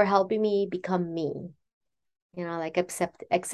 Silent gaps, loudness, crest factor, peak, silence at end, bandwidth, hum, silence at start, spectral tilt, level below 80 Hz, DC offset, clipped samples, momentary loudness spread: 1.73-1.81 s, 2.22-2.30 s; -29 LUFS; 20 dB; -8 dBFS; 0 s; 12.5 kHz; none; 0 s; -5.5 dB/octave; -68 dBFS; under 0.1%; under 0.1%; 14 LU